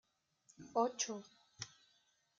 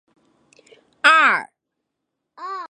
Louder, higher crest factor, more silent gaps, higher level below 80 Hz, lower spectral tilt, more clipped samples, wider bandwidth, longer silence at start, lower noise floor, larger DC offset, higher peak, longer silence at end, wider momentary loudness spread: second, -41 LUFS vs -15 LUFS; about the same, 24 dB vs 20 dB; neither; second, -86 dBFS vs -80 dBFS; first, -2.5 dB/octave vs -1 dB/octave; neither; second, 9.4 kHz vs 11 kHz; second, 0.6 s vs 1.05 s; about the same, -77 dBFS vs -79 dBFS; neither; second, -22 dBFS vs -2 dBFS; first, 0.7 s vs 0.05 s; second, 14 LU vs 20 LU